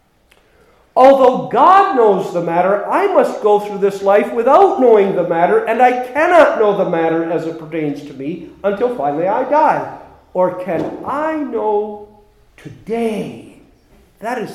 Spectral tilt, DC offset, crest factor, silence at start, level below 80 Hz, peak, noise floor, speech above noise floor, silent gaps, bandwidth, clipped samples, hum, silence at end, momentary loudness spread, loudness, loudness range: -6.5 dB/octave; under 0.1%; 14 dB; 0.95 s; -56 dBFS; 0 dBFS; -53 dBFS; 40 dB; none; 14 kHz; under 0.1%; none; 0 s; 15 LU; -14 LUFS; 9 LU